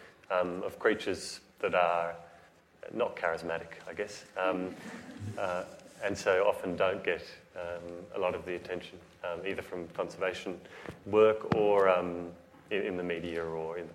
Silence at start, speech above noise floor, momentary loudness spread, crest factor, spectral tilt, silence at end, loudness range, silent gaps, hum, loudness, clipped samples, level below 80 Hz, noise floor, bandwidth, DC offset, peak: 0 s; 27 dB; 16 LU; 22 dB; -5 dB/octave; 0 s; 7 LU; none; none; -33 LUFS; under 0.1%; -66 dBFS; -60 dBFS; 14.5 kHz; under 0.1%; -10 dBFS